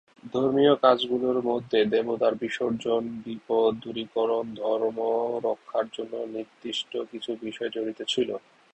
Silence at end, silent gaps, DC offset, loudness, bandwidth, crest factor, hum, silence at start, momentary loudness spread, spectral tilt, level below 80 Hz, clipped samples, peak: 0.35 s; none; under 0.1%; -27 LUFS; 8.6 kHz; 22 dB; none; 0.25 s; 12 LU; -5 dB/octave; -68 dBFS; under 0.1%; -6 dBFS